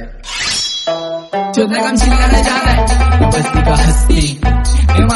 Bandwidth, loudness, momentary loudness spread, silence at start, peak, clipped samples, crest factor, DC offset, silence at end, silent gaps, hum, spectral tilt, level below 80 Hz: 12 kHz; -13 LUFS; 7 LU; 0 s; 0 dBFS; under 0.1%; 12 dB; under 0.1%; 0 s; none; none; -4.5 dB/octave; -14 dBFS